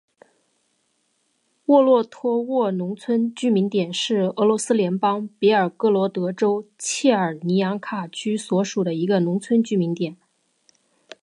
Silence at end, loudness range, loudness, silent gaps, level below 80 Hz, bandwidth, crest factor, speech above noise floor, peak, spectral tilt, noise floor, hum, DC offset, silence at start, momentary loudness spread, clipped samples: 1.1 s; 2 LU; -21 LUFS; none; -74 dBFS; 11.5 kHz; 18 dB; 48 dB; -4 dBFS; -5.5 dB/octave; -69 dBFS; none; under 0.1%; 1.7 s; 8 LU; under 0.1%